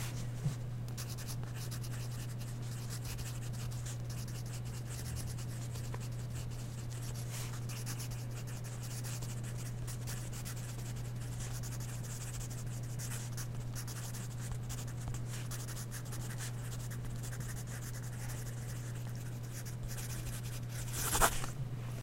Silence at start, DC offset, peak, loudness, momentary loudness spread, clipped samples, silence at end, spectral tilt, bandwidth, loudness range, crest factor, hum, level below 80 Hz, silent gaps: 0 s; under 0.1%; -12 dBFS; -41 LUFS; 2 LU; under 0.1%; 0 s; -4.5 dB/octave; 16.5 kHz; 1 LU; 28 dB; none; -50 dBFS; none